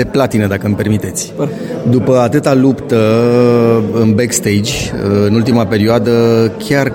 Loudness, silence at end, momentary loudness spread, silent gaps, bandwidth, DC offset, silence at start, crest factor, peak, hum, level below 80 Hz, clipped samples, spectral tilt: -12 LUFS; 0 s; 7 LU; none; 17 kHz; under 0.1%; 0 s; 12 dB; 0 dBFS; none; -40 dBFS; under 0.1%; -6 dB/octave